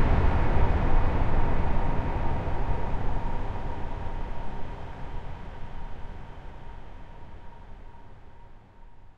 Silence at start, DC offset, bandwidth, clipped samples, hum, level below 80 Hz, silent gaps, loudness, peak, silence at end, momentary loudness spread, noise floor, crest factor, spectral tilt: 0 s; under 0.1%; 4.9 kHz; under 0.1%; none; -30 dBFS; none; -31 LUFS; -10 dBFS; 0.05 s; 22 LU; -46 dBFS; 16 dB; -8.5 dB/octave